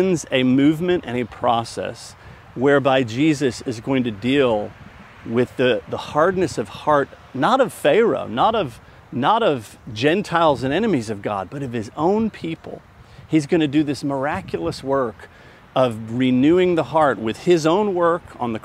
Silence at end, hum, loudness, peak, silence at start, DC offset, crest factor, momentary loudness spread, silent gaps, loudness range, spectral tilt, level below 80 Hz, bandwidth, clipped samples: 0.05 s; none; -20 LUFS; -2 dBFS; 0 s; under 0.1%; 18 dB; 11 LU; none; 3 LU; -6 dB/octave; -52 dBFS; 14.5 kHz; under 0.1%